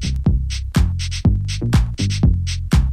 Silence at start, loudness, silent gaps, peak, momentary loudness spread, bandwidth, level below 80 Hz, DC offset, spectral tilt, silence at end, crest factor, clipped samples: 0 s; -19 LUFS; none; -4 dBFS; 3 LU; 13.5 kHz; -20 dBFS; under 0.1%; -6 dB/octave; 0 s; 12 dB; under 0.1%